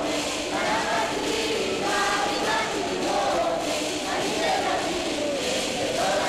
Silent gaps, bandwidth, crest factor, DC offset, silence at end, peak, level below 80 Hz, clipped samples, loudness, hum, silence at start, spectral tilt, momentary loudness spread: none; 16 kHz; 10 dB; under 0.1%; 0 s; -14 dBFS; -52 dBFS; under 0.1%; -25 LUFS; none; 0 s; -2.5 dB/octave; 3 LU